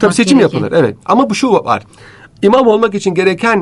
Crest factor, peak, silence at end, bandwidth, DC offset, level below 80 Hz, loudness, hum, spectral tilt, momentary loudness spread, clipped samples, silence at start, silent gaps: 12 dB; 0 dBFS; 0 s; 11.5 kHz; under 0.1%; -52 dBFS; -11 LUFS; none; -5.5 dB/octave; 5 LU; under 0.1%; 0 s; none